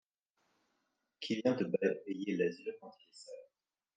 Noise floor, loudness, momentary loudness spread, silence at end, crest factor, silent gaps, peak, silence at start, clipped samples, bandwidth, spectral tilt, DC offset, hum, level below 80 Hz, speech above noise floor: -83 dBFS; -36 LUFS; 20 LU; 0.5 s; 20 dB; none; -18 dBFS; 1.2 s; under 0.1%; 9.4 kHz; -6 dB/octave; under 0.1%; none; -88 dBFS; 46 dB